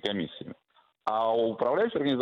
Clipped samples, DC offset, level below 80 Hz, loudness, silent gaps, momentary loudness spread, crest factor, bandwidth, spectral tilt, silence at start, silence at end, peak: under 0.1%; under 0.1%; -70 dBFS; -28 LUFS; none; 14 LU; 18 dB; 7.6 kHz; -7 dB/octave; 0.05 s; 0 s; -12 dBFS